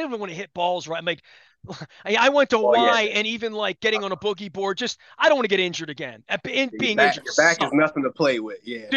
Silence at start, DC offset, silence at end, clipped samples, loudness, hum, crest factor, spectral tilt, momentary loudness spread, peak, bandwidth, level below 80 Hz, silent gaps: 0 s; under 0.1%; 0 s; under 0.1%; -21 LUFS; none; 18 dB; -3.5 dB/octave; 15 LU; -4 dBFS; 9 kHz; -66 dBFS; none